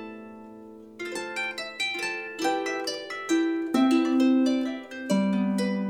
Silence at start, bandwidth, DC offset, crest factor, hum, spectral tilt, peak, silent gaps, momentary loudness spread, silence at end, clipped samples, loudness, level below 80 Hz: 0 s; 15 kHz; under 0.1%; 16 dB; none; -5 dB/octave; -10 dBFS; none; 20 LU; 0 s; under 0.1%; -26 LUFS; -72 dBFS